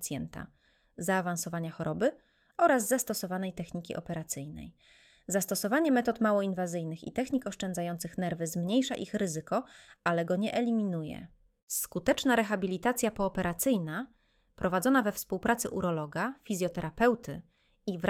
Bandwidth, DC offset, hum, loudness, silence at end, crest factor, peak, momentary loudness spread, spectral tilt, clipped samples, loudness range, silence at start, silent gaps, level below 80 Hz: 17 kHz; under 0.1%; none; -31 LUFS; 0 s; 20 dB; -12 dBFS; 12 LU; -4.5 dB/octave; under 0.1%; 2 LU; 0 s; 11.63-11.67 s; -60 dBFS